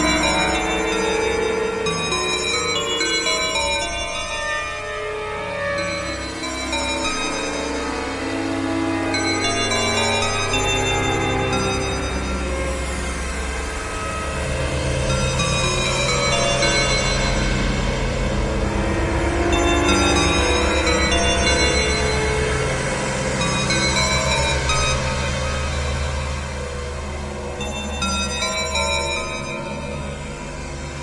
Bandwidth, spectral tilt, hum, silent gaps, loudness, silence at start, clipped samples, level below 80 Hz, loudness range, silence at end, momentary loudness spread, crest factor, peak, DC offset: 11.5 kHz; -3.5 dB/octave; none; none; -20 LUFS; 0 s; under 0.1%; -30 dBFS; 6 LU; 0 s; 9 LU; 16 dB; -4 dBFS; under 0.1%